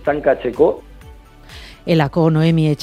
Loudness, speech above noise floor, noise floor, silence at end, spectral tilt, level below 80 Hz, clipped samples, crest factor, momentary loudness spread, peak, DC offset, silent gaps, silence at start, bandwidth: -16 LUFS; 25 dB; -40 dBFS; 0 s; -8 dB/octave; -42 dBFS; under 0.1%; 16 dB; 18 LU; 0 dBFS; under 0.1%; none; 0 s; 10 kHz